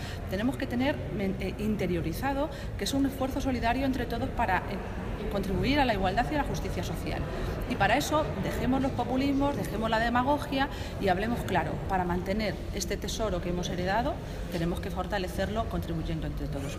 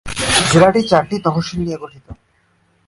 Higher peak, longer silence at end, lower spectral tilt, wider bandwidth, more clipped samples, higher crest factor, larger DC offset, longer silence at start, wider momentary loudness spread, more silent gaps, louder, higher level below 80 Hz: second, -10 dBFS vs 0 dBFS; second, 0 s vs 0.75 s; about the same, -5.5 dB/octave vs -4.5 dB/octave; first, 16 kHz vs 11.5 kHz; neither; about the same, 18 dB vs 16 dB; neither; about the same, 0 s vs 0.05 s; second, 7 LU vs 15 LU; neither; second, -30 LUFS vs -14 LUFS; about the same, -40 dBFS vs -40 dBFS